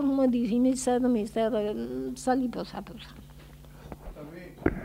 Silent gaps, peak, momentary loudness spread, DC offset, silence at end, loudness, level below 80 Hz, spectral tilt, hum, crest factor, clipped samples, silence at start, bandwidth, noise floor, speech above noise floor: none; -10 dBFS; 20 LU; under 0.1%; 0 s; -28 LUFS; -48 dBFS; -5.5 dB/octave; none; 18 dB; under 0.1%; 0 s; 15.5 kHz; -48 dBFS; 21 dB